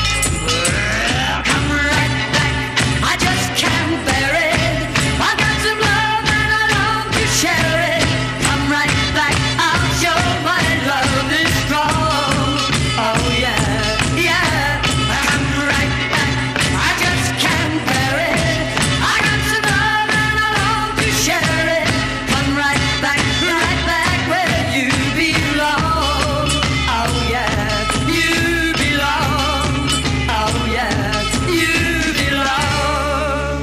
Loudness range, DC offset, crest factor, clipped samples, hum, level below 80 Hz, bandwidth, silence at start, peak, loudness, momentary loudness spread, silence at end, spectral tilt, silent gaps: 1 LU; under 0.1%; 16 dB; under 0.1%; none; -30 dBFS; 15.5 kHz; 0 s; 0 dBFS; -15 LUFS; 3 LU; 0 s; -3.5 dB/octave; none